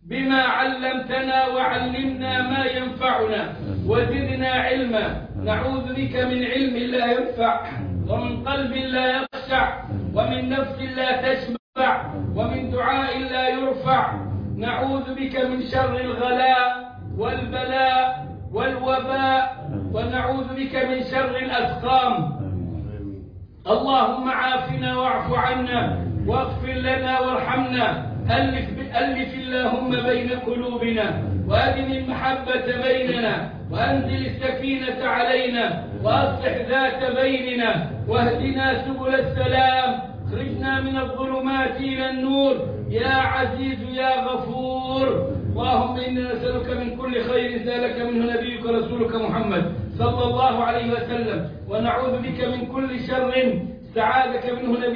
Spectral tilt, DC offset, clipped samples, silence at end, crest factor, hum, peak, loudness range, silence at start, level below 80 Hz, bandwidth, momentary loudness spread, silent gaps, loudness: -8.5 dB/octave; under 0.1%; under 0.1%; 0 s; 16 dB; none; -6 dBFS; 2 LU; 0.05 s; -42 dBFS; 5.2 kHz; 7 LU; 11.59-11.73 s; -23 LUFS